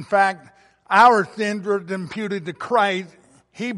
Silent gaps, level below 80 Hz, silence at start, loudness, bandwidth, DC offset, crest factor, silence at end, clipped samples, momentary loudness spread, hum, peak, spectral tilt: none; -66 dBFS; 0 s; -20 LUFS; 11.5 kHz; under 0.1%; 18 dB; 0 s; under 0.1%; 15 LU; none; -2 dBFS; -5 dB/octave